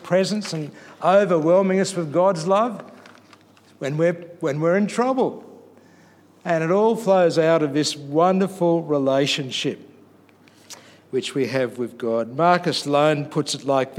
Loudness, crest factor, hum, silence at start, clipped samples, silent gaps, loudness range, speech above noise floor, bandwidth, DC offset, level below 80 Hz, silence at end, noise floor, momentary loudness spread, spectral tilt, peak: -21 LUFS; 18 dB; none; 0 s; under 0.1%; none; 5 LU; 32 dB; 15 kHz; under 0.1%; -76 dBFS; 0 s; -52 dBFS; 11 LU; -5.5 dB/octave; -4 dBFS